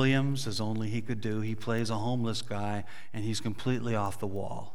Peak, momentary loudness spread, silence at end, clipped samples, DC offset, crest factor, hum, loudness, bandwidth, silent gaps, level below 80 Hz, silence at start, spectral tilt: -14 dBFS; 6 LU; 0.05 s; under 0.1%; 2%; 18 dB; none; -33 LUFS; 15.5 kHz; none; -64 dBFS; 0 s; -6 dB/octave